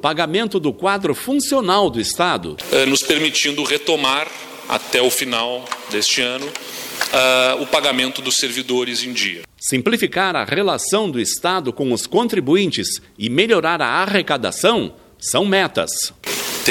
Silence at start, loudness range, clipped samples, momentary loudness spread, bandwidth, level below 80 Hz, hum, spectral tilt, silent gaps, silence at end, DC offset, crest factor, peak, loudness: 0 s; 2 LU; under 0.1%; 8 LU; 17.5 kHz; -56 dBFS; none; -2.5 dB/octave; none; 0 s; under 0.1%; 18 dB; 0 dBFS; -18 LUFS